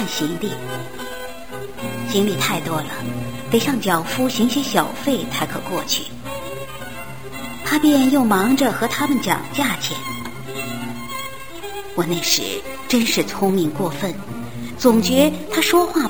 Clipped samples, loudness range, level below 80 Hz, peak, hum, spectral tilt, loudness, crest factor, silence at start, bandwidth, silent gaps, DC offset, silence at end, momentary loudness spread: under 0.1%; 5 LU; -48 dBFS; 0 dBFS; none; -4 dB/octave; -20 LUFS; 20 dB; 0 s; over 20 kHz; none; 2%; 0 s; 15 LU